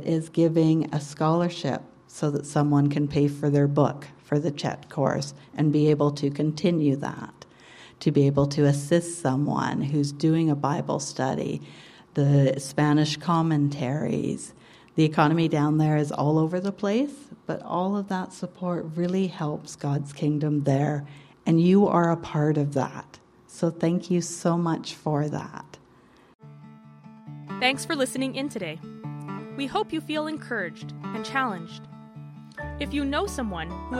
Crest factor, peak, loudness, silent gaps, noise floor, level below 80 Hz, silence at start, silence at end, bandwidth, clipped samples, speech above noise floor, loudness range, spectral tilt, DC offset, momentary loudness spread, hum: 20 dB; -6 dBFS; -25 LUFS; 26.35-26.39 s; -55 dBFS; -54 dBFS; 0 s; 0 s; 12.5 kHz; under 0.1%; 31 dB; 7 LU; -6.5 dB/octave; under 0.1%; 14 LU; none